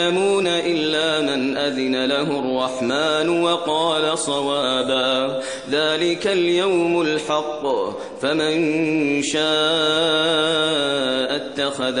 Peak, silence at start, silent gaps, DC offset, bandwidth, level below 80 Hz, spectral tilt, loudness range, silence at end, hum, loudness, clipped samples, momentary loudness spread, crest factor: -6 dBFS; 0 s; none; 0.2%; 10.5 kHz; -62 dBFS; -3.5 dB/octave; 2 LU; 0 s; none; -20 LUFS; under 0.1%; 5 LU; 14 dB